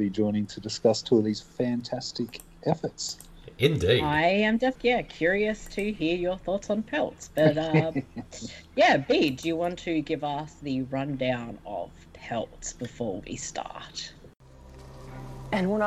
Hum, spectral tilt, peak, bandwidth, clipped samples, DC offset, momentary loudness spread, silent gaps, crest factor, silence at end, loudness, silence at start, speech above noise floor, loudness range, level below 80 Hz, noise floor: none; -5 dB/octave; -6 dBFS; 14 kHz; under 0.1%; under 0.1%; 15 LU; none; 20 dB; 0 s; -27 LUFS; 0 s; 20 dB; 10 LU; -52 dBFS; -48 dBFS